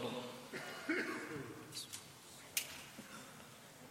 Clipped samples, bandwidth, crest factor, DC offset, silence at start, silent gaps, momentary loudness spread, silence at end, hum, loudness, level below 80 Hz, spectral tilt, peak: under 0.1%; 16.5 kHz; 30 dB; under 0.1%; 0 s; none; 15 LU; 0 s; none; -45 LUFS; -80 dBFS; -2.5 dB/octave; -16 dBFS